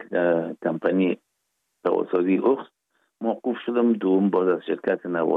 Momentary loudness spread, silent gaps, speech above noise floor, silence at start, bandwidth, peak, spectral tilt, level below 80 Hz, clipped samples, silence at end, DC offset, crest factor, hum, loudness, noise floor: 7 LU; none; 54 dB; 0 s; 4.1 kHz; -8 dBFS; -9.5 dB/octave; -78 dBFS; under 0.1%; 0 s; under 0.1%; 14 dB; none; -24 LUFS; -76 dBFS